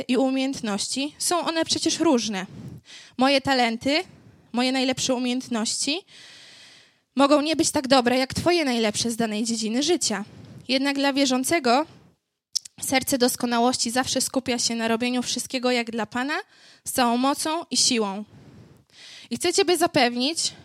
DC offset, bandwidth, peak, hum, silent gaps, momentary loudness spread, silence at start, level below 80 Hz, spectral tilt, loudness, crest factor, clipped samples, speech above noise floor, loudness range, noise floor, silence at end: under 0.1%; 15.5 kHz; -4 dBFS; none; none; 11 LU; 0 s; -62 dBFS; -2.5 dB/octave; -23 LUFS; 20 dB; under 0.1%; 39 dB; 2 LU; -62 dBFS; 0.1 s